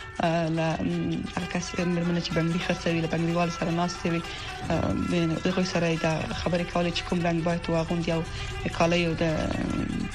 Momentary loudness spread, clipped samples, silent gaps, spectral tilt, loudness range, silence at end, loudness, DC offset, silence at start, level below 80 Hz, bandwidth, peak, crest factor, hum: 5 LU; under 0.1%; none; -6 dB/octave; 1 LU; 0 s; -27 LUFS; under 0.1%; 0 s; -42 dBFS; 11 kHz; -10 dBFS; 16 dB; none